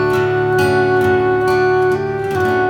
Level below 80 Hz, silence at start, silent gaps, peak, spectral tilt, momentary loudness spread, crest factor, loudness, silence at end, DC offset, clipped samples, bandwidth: -44 dBFS; 0 s; none; -4 dBFS; -6.5 dB/octave; 4 LU; 12 dB; -15 LUFS; 0 s; under 0.1%; under 0.1%; 16.5 kHz